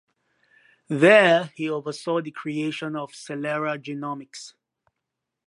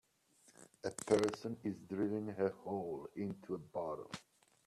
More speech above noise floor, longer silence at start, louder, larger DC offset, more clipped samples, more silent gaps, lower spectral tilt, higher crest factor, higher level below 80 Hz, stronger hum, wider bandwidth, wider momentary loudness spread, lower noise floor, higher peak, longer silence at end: first, 60 dB vs 31 dB; first, 0.9 s vs 0.6 s; first, -23 LUFS vs -40 LUFS; neither; neither; neither; about the same, -5.5 dB/octave vs -5.5 dB/octave; about the same, 22 dB vs 24 dB; about the same, -80 dBFS vs -76 dBFS; neither; second, 11 kHz vs 13.5 kHz; first, 19 LU vs 12 LU; first, -83 dBFS vs -71 dBFS; first, -2 dBFS vs -18 dBFS; first, 1 s vs 0.45 s